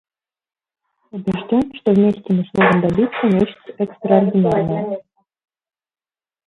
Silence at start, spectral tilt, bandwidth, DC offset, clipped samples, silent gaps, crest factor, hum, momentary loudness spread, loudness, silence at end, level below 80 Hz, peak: 1.15 s; -9 dB/octave; 4.7 kHz; under 0.1%; under 0.1%; none; 18 dB; none; 11 LU; -17 LUFS; 1.45 s; -50 dBFS; 0 dBFS